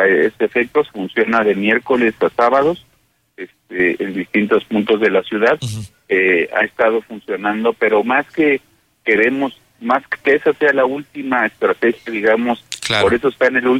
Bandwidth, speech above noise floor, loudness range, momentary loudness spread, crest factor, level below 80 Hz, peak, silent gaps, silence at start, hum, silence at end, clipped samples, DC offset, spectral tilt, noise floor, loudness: 14.5 kHz; 44 dB; 1 LU; 9 LU; 14 dB; -54 dBFS; -2 dBFS; none; 0 s; none; 0 s; under 0.1%; under 0.1%; -5 dB/octave; -60 dBFS; -16 LUFS